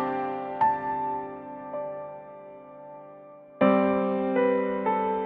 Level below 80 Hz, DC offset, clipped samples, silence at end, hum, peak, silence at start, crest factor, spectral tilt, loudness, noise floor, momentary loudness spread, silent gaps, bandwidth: -64 dBFS; under 0.1%; under 0.1%; 0 s; none; -8 dBFS; 0 s; 20 dB; -10 dB/octave; -26 LUFS; -47 dBFS; 22 LU; none; 4.6 kHz